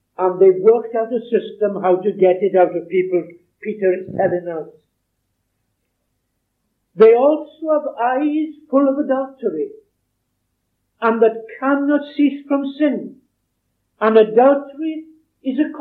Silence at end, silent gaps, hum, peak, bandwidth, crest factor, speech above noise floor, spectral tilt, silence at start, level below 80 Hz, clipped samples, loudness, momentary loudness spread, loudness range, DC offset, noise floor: 0 s; none; none; -2 dBFS; 4.4 kHz; 16 dB; 55 dB; -9.5 dB/octave; 0.2 s; -72 dBFS; under 0.1%; -17 LUFS; 14 LU; 6 LU; under 0.1%; -71 dBFS